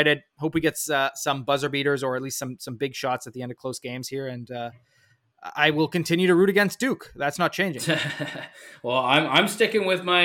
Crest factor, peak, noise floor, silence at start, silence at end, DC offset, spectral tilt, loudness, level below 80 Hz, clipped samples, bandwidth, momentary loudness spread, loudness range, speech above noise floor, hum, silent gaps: 20 dB; -4 dBFS; -59 dBFS; 0 s; 0 s; under 0.1%; -4 dB/octave; -24 LUFS; -62 dBFS; under 0.1%; 17 kHz; 15 LU; 7 LU; 34 dB; none; none